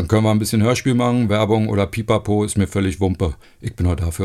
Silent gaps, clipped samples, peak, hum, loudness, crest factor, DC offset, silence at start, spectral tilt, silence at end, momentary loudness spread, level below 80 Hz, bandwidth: none; under 0.1%; -4 dBFS; none; -19 LUFS; 14 dB; under 0.1%; 0 s; -6.5 dB/octave; 0 s; 6 LU; -36 dBFS; 14.5 kHz